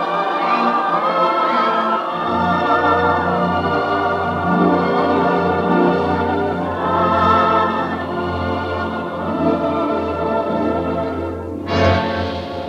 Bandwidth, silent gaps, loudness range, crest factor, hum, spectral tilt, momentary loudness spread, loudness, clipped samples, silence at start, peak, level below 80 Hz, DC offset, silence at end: 9.8 kHz; none; 4 LU; 16 dB; none; -7.5 dB/octave; 7 LU; -17 LUFS; under 0.1%; 0 s; -2 dBFS; -44 dBFS; under 0.1%; 0 s